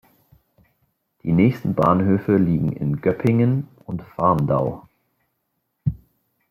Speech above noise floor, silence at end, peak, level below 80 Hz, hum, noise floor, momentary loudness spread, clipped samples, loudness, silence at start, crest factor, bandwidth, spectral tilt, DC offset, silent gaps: 55 dB; 0.55 s; -4 dBFS; -48 dBFS; none; -74 dBFS; 14 LU; under 0.1%; -20 LUFS; 1.25 s; 18 dB; 14 kHz; -10 dB/octave; under 0.1%; none